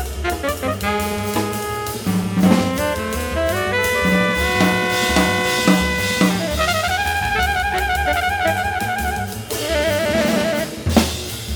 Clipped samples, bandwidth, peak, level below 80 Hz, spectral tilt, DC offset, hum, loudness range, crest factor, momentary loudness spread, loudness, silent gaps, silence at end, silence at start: under 0.1%; over 20 kHz; 0 dBFS; -32 dBFS; -4.5 dB/octave; under 0.1%; none; 3 LU; 18 dB; 7 LU; -18 LUFS; none; 0 s; 0 s